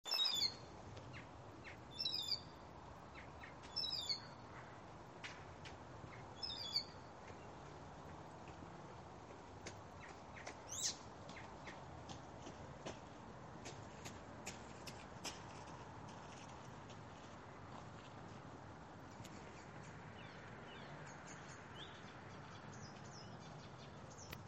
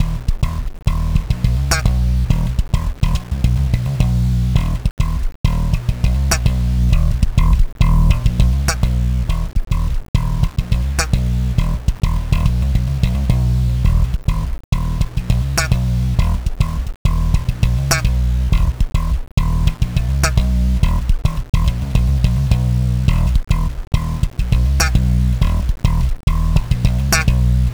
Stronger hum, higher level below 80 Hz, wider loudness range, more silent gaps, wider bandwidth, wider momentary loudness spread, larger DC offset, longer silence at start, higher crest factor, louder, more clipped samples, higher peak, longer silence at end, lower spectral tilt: neither; second, -70 dBFS vs -18 dBFS; first, 10 LU vs 2 LU; second, none vs 4.91-4.97 s, 5.35-5.44 s, 10.08-10.14 s, 14.64-14.72 s, 16.96-17.05 s, 19.31-19.37 s, 23.87-23.91 s, 26.23-26.27 s; second, 8.8 kHz vs over 20 kHz; first, 14 LU vs 5 LU; neither; about the same, 0.05 s vs 0 s; first, 26 dB vs 14 dB; second, -49 LUFS vs -18 LUFS; neither; second, -26 dBFS vs 0 dBFS; about the same, 0 s vs 0 s; second, -2.5 dB/octave vs -5.5 dB/octave